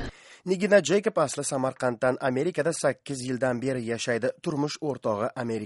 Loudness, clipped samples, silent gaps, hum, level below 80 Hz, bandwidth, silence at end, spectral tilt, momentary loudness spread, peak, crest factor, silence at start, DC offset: -27 LUFS; under 0.1%; none; none; -56 dBFS; 11.5 kHz; 0 s; -5 dB/octave; 8 LU; -8 dBFS; 18 dB; 0 s; under 0.1%